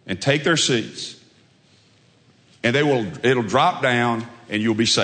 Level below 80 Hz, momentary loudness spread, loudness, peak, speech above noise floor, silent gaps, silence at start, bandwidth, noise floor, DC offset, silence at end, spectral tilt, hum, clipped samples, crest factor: -62 dBFS; 10 LU; -20 LUFS; -2 dBFS; 36 dB; none; 0.05 s; 9.4 kHz; -56 dBFS; under 0.1%; 0 s; -4 dB/octave; none; under 0.1%; 20 dB